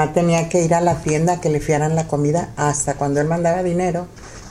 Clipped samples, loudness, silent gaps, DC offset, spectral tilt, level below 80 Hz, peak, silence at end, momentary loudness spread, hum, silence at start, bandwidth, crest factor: under 0.1%; -19 LUFS; none; under 0.1%; -6 dB/octave; -42 dBFS; -4 dBFS; 0 s; 4 LU; none; 0 s; 13 kHz; 14 dB